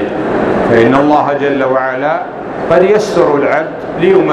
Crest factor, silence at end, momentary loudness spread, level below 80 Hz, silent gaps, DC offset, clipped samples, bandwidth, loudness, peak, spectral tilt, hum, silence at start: 10 dB; 0 s; 7 LU; -42 dBFS; none; under 0.1%; 0.2%; 10.5 kHz; -11 LUFS; 0 dBFS; -6.5 dB/octave; none; 0 s